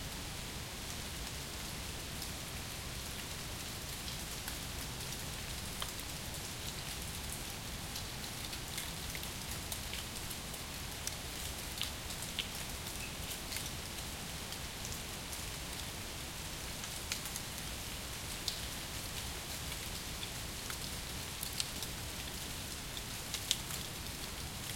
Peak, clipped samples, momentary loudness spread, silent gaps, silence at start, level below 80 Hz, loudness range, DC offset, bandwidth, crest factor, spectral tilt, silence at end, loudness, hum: -6 dBFS; under 0.1%; 3 LU; none; 0 s; -52 dBFS; 2 LU; under 0.1%; 17 kHz; 36 dB; -2 dB/octave; 0 s; -41 LUFS; none